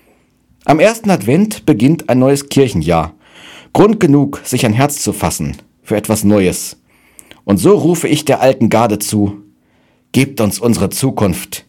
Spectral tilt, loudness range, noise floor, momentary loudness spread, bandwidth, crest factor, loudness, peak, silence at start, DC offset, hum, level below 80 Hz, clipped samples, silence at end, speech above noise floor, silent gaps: -5.5 dB/octave; 2 LU; -54 dBFS; 8 LU; 18.5 kHz; 14 dB; -13 LUFS; 0 dBFS; 0.65 s; under 0.1%; none; -40 dBFS; 0.6%; 0.1 s; 42 dB; none